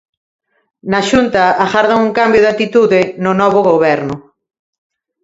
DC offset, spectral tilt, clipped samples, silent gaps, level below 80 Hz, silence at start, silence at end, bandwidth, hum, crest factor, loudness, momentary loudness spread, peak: under 0.1%; -5.5 dB/octave; under 0.1%; none; -46 dBFS; 0.85 s; 1.05 s; 8 kHz; none; 12 dB; -12 LUFS; 7 LU; 0 dBFS